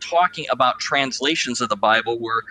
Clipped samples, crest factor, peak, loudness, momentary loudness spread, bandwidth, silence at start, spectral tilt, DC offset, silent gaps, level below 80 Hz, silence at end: under 0.1%; 18 dB; -2 dBFS; -20 LUFS; 4 LU; 10 kHz; 0 s; -2.5 dB/octave; under 0.1%; none; -64 dBFS; 0 s